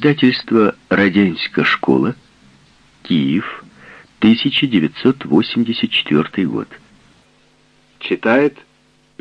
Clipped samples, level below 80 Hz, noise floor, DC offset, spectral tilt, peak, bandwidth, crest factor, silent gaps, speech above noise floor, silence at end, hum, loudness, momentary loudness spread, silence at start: under 0.1%; -56 dBFS; -55 dBFS; under 0.1%; -7.5 dB/octave; 0 dBFS; 7.2 kHz; 16 dB; none; 40 dB; 0.7 s; none; -16 LUFS; 9 LU; 0 s